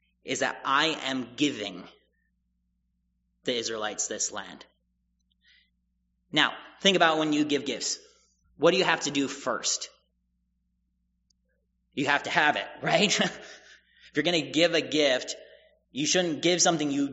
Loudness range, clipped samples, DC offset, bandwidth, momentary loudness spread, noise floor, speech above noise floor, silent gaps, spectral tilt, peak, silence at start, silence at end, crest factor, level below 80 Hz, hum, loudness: 9 LU; under 0.1%; under 0.1%; 8 kHz; 14 LU; -75 dBFS; 48 dB; none; -1.5 dB/octave; -6 dBFS; 0.25 s; 0 s; 24 dB; -70 dBFS; none; -26 LUFS